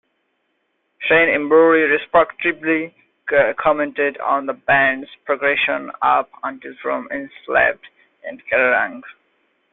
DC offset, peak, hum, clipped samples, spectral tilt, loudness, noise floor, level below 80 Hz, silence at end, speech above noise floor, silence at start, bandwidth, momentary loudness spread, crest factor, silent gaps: under 0.1%; -2 dBFS; none; under 0.1%; -9 dB/octave; -17 LUFS; -69 dBFS; -56 dBFS; 0.6 s; 51 dB; 1 s; 4.1 kHz; 15 LU; 18 dB; none